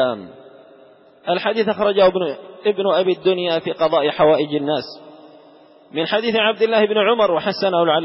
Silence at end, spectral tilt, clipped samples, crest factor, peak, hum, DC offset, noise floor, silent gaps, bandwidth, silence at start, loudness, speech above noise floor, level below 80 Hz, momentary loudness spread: 0 s; -9.5 dB/octave; under 0.1%; 14 dB; -4 dBFS; none; under 0.1%; -48 dBFS; none; 5.8 kHz; 0 s; -18 LUFS; 30 dB; -62 dBFS; 9 LU